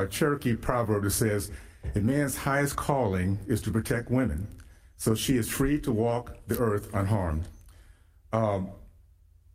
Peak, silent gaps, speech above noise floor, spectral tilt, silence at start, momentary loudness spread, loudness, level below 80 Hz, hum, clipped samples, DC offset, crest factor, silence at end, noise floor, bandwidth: -10 dBFS; none; 30 dB; -5.5 dB/octave; 0 s; 7 LU; -28 LUFS; -44 dBFS; none; under 0.1%; under 0.1%; 20 dB; 0.65 s; -57 dBFS; 16 kHz